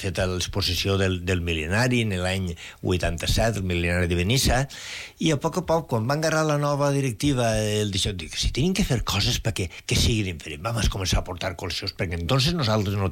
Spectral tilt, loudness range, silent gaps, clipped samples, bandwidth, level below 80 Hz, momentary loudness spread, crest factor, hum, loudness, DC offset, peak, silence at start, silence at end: -4.5 dB/octave; 1 LU; none; under 0.1%; 17 kHz; -36 dBFS; 7 LU; 12 dB; none; -24 LUFS; under 0.1%; -12 dBFS; 0 s; 0 s